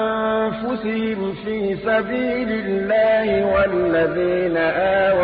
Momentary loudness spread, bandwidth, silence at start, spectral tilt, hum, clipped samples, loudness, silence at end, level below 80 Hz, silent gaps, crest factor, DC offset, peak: 7 LU; 5 kHz; 0 s; -11 dB/octave; none; under 0.1%; -20 LUFS; 0 s; -44 dBFS; none; 10 dB; under 0.1%; -8 dBFS